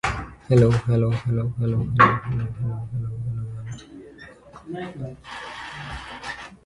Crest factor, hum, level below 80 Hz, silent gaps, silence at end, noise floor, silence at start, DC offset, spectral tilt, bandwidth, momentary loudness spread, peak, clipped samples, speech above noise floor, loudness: 22 dB; none; -44 dBFS; none; 0.1 s; -45 dBFS; 0.05 s; under 0.1%; -7.5 dB/octave; 11 kHz; 21 LU; -2 dBFS; under 0.1%; 23 dB; -23 LUFS